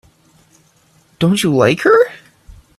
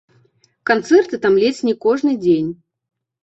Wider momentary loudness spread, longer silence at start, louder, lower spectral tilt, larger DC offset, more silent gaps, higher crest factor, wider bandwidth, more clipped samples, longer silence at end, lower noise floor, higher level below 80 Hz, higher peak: about the same, 7 LU vs 5 LU; first, 1.2 s vs 0.65 s; first, -13 LUFS vs -16 LUFS; about the same, -5.5 dB/octave vs -5.5 dB/octave; neither; neither; about the same, 16 dB vs 16 dB; first, 14 kHz vs 8.2 kHz; neither; about the same, 0.65 s vs 0.7 s; second, -53 dBFS vs -58 dBFS; first, -50 dBFS vs -60 dBFS; about the same, 0 dBFS vs -2 dBFS